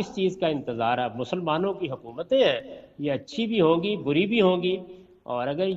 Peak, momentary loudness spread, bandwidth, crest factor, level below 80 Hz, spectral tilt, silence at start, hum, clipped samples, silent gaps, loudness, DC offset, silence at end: -8 dBFS; 11 LU; 7.8 kHz; 16 dB; -62 dBFS; -6.5 dB/octave; 0 s; none; under 0.1%; none; -25 LUFS; under 0.1%; 0 s